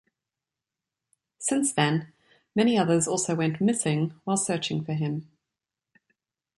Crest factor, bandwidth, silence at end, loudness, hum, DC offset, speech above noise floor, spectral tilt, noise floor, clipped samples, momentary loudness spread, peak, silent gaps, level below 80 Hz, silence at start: 18 dB; 11.5 kHz; 1.35 s; -26 LUFS; none; under 0.1%; 63 dB; -4.5 dB/octave; -89 dBFS; under 0.1%; 8 LU; -10 dBFS; none; -70 dBFS; 1.4 s